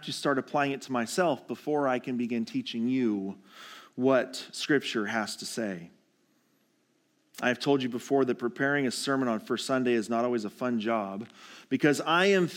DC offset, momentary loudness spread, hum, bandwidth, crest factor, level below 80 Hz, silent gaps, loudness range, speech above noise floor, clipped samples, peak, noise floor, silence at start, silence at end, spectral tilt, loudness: under 0.1%; 10 LU; none; 16.5 kHz; 18 dB; -84 dBFS; none; 4 LU; 42 dB; under 0.1%; -10 dBFS; -71 dBFS; 0 s; 0 s; -4.5 dB/octave; -29 LUFS